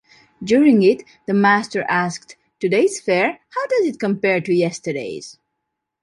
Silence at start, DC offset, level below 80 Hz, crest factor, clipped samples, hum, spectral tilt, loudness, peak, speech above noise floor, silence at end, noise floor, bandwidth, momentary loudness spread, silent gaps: 0.4 s; under 0.1%; -64 dBFS; 16 dB; under 0.1%; none; -5.5 dB/octave; -18 LUFS; -2 dBFS; 60 dB; 0.7 s; -78 dBFS; 11.5 kHz; 12 LU; none